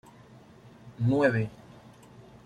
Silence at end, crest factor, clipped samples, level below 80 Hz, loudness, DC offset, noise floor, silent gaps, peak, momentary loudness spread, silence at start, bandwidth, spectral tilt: 0.25 s; 20 dB; under 0.1%; -62 dBFS; -27 LUFS; under 0.1%; -53 dBFS; none; -10 dBFS; 26 LU; 0.85 s; 10 kHz; -8.5 dB/octave